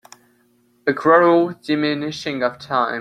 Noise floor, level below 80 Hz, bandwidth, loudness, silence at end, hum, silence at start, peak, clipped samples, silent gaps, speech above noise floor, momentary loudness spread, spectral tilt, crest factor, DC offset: -59 dBFS; -64 dBFS; 10.5 kHz; -18 LUFS; 0 s; none; 0.85 s; 0 dBFS; under 0.1%; none; 41 dB; 11 LU; -6 dB/octave; 18 dB; under 0.1%